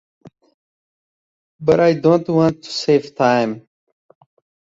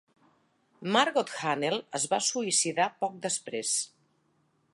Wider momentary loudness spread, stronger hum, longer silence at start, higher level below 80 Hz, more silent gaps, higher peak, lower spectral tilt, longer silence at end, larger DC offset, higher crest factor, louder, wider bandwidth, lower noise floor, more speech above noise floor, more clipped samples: about the same, 9 LU vs 7 LU; neither; first, 1.6 s vs 0.8 s; first, -58 dBFS vs -82 dBFS; neither; first, -2 dBFS vs -8 dBFS; first, -6.5 dB/octave vs -2 dB/octave; first, 1.1 s vs 0.85 s; neither; second, 18 dB vs 24 dB; first, -17 LUFS vs -28 LUFS; second, 7.8 kHz vs 11.5 kHz; first, under -90 dBFS vs -71 dBFS; first, over 74 dB vs 42 dB; neither